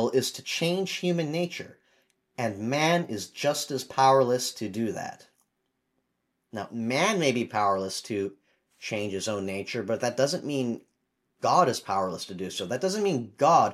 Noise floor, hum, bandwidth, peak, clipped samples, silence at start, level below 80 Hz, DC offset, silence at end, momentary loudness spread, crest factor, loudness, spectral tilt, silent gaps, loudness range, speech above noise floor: -78 dBFS; none; 15.5 kHz; -8 dBFS; under 0.1%; 0 s; -76 dBFS; under 0.1%; 0 s; 12 LU; 20 dB; -27 LUFS; -4.5 dB/octave; none; 4 LU; 51 dB